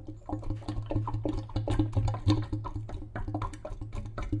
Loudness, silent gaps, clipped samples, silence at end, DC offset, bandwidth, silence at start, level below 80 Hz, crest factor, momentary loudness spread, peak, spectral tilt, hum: -34 LUFS; none; under 0.1%; 0 s; under 0.1%; 10 kHz; 0 s; -38 dBFS; 20 dB; 11 LU; -12 dBFS; -8 dB/octave; none